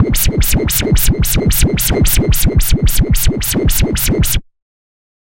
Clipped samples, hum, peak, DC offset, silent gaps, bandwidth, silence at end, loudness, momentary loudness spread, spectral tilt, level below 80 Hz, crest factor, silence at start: under 0.1%; none; 0 dBFS; under 0.1%; none; 17 kHz; 0.8 s; -13 LUFS; 2 LU; -4.5 dB/octave; -16 dBFS; 12 dB; 0 s